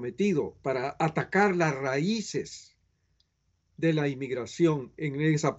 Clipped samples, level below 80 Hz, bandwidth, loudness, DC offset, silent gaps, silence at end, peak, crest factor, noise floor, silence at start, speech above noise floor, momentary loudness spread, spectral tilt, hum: under 0.1%; -66 dBFS; 8.2 kHz; -28 LUFS; under 0.1%; none; 0 s; -10 dBFS; 18 dB; -74 dBFS; 0 s; 46 dB; 9 LU; -6 dB/octave; none